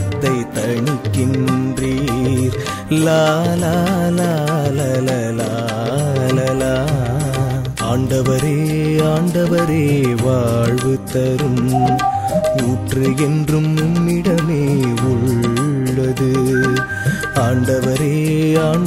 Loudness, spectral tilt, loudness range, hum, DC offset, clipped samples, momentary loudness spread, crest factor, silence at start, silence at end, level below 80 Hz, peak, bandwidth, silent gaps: -16 LUFS; -6.5 dB/octave; 2 LU; none; under 0.1%; under 0.1%; 4 LU; 14 dB; 0 s; 0 s; -38 dBFS; -2 dBFS; 16 kHz; none